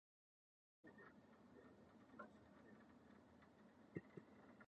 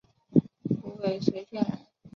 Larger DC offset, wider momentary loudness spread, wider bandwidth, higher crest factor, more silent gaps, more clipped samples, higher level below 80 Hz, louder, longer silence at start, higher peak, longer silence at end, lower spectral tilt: neither; first, 10 LU vs 6 LU; about the same, 7.6 kHz vs 7 kHz; first, 28 dB vs 22 dB; neither; neither; second, -86 dBFS vs -62 dBFS; second, -65 LUFS vs -30 LUFS; first, 0.85 s vs 0.3 s; second, -36 dBFS vs -8 dBFS; about the same, 0 s vs 0.1 s; second, -6.5 dB/octave vs -8.5 dB/octave